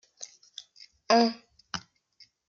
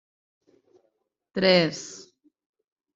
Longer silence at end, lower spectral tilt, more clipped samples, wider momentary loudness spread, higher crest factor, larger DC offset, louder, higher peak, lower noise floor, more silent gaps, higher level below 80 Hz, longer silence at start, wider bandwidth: second, 0.7 s vs 1 s; second, -3 dB/octave vs -4.5 dB/octave; neither; about the same, 23 LU vs 21 LU; about the same, 22 dB vs 24 dB; neither; second, -27 LUFS vs -22 LUFS; second, -10 dBFS vs -6 dBFS; second, -62 dBFS vs -74 dBFS; neither; second, -72 dBFS vs -66 dBFS; second, 0.2 s vs 1.35 s; about the same, 7.6 kHz vs 7.8 kHz